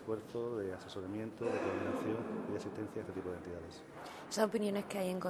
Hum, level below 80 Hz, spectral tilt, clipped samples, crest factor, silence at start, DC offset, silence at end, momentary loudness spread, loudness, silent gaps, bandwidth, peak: none; -70 dBFS; -5.5 dB/octave; under 0.1%; 22 dB; 0 s; under 0.1%; 0 s; 12 LU; -40 LUFS; none; 19.5 kHz; -18 dBFS